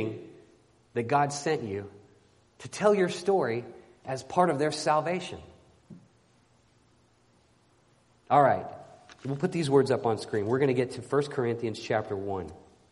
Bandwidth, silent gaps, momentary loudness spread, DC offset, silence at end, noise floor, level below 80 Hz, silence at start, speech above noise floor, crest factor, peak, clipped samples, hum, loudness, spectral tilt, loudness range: 11.5 kHz; none; 18 LU; under 0.1%; 0.35 s; -64 dBFS; -66 dBFS; 0 s; 37 dB; 22 dB; -8 dBFS; under 0.1%; none; -28 LUFS; -5.5 dB/octave; 5 LU